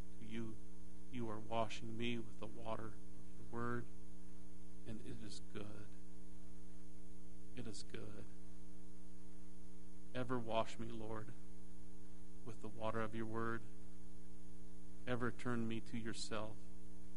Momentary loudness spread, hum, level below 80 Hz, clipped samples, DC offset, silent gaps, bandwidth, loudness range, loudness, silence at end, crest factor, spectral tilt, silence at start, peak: 17 LU; none; -62 dBFS; under 0.1%; 1%; none; 10.5 kHz; 10 LU; -47 LUFS; 0 s; 26 dB; -5.5 dB/octave; 0 s; -24 dBFS